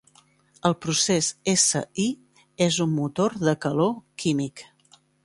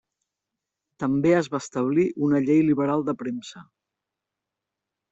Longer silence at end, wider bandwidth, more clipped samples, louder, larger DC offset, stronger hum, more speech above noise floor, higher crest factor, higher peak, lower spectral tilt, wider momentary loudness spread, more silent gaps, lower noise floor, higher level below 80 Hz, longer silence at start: second, 0.6 s vs 1.5 s; first, 11.5 kHz vs 8 kHz; neither; about the same, -24 LUFS vs -23 LUFS; neither; neither; second, 36 dB vs 63 dB; about the same, 20 dB vs 16 dB; about the same, -6 dBFS vs -8 dBFS; second, -4 dB/octave vs -7 dB/octave; second, 8 LU vs 11 LU; neither; second, -59 dBFS vs -86 dBFS; about the same, -62 dBFS vs -64 dBFS; second, 0.65 s vs 1 s